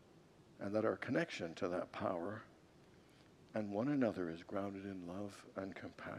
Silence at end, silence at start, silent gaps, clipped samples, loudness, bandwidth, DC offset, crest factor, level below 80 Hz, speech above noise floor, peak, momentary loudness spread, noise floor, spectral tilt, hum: 0 s; 0 s; none; under 0.1%; -42 LUFS; 12.5 kHz; under 0.1%; 20 dB; -78 dBFS; 23 dB; -24 dBFS; 11 LU; -65 dBFS; -6.5 dB/octave; none